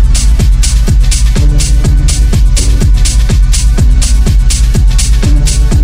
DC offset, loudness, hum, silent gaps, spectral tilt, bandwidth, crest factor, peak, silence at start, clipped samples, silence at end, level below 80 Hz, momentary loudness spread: under 0.1%; -10 LUFS; none; none; -4.5 dB/octave; 15.5 kHz; 6 dB; 0 dBFS; 0 s; 0.2%; 0 s; -6 dBFS; 1 LU